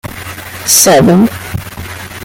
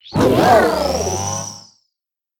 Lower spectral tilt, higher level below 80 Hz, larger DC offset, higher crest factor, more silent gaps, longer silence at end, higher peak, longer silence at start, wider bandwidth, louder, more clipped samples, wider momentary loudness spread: about the same, -3.5 dB/octave vs -4.5 dB/octave; about the same, -38 dBFS vs -40 dBFS; neither; second, 12 dB vs 18 dB; neither; second, 0 s vs 0.8 s; about the same, 0 dBFS vs 0 dBFS; about the same, 0.05 s vs 0.05 s; about the same, over 20 kHz vs 18.5 kHz; first, -7 LUFS vs -16 LUFS; first, 0.2% vs under 0.1%; first, 19 LU vs 13 LU